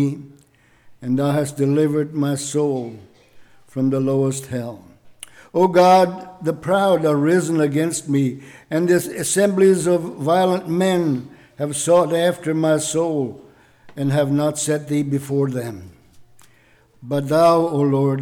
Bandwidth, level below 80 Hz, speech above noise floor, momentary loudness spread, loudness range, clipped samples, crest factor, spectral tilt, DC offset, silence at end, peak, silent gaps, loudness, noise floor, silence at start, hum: 18.5 kHz; -62 dBFS; 36 dB; 12 LU; 5 LU; under 0.1%; 14 dB; -6 dB/octave; under 0.1%; 0 s; -6 dBFS; none; -19 LUFS; -54 dBFS; 0 s; none